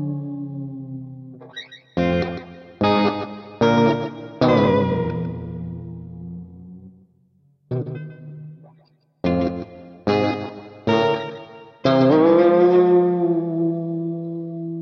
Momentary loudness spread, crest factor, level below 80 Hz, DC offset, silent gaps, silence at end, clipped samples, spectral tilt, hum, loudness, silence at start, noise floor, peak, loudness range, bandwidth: 22 LU; 16 dB; -52 dBFS; under 0.1%; none; 0 s; under 0.1%; -8 dB/octave; none; -20 LUFS; 0 s; -59 dBFS; -6 dBFS; 15 LU; 6.4 kHz